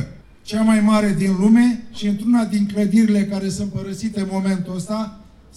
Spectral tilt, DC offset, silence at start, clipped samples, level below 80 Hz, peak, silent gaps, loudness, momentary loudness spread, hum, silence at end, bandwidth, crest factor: -6.5 dB/octave; under 0.1%; 0 s; under 0.1%; -48 dBFS; -4 dBFS; none; -19 LUFS; 11 LU; none; 0.35 s; 12.5 kHz; 14 dB